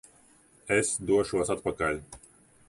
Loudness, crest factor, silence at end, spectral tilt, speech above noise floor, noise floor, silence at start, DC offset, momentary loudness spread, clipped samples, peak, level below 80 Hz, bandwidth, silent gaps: -28 LUFS; 18 dB; 0.5 s; -4 dB/octave; 32 dB; -60 dBFS; 0.65 s; under 0.1%; 22 LU; under 0.1%; -12 dBFS; -54 dBFS; 11.5 kHz; none